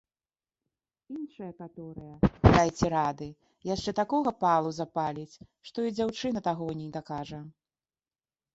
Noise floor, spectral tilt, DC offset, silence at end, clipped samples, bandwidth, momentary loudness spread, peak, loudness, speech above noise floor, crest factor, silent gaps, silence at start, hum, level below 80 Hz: under -90 dBFS; -6.5 dB/octave; under 0.1%; 1.05 s; under 0.1%; 8 kHz; 20 LU; -2 dBFS; -28 LUFS; over 61 dB; 28 dB; none; 1.1 s; none; -44 dBFS